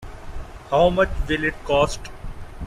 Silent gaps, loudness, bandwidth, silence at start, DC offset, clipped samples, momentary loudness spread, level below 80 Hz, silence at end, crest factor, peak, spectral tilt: none; -21 LUFS; 13 kHz; 0 s; under 0.1%; under 0.1%; 21 LU; -32 dBFS; 0 s; 18 dB; -4 dBFS; -5 dB/octave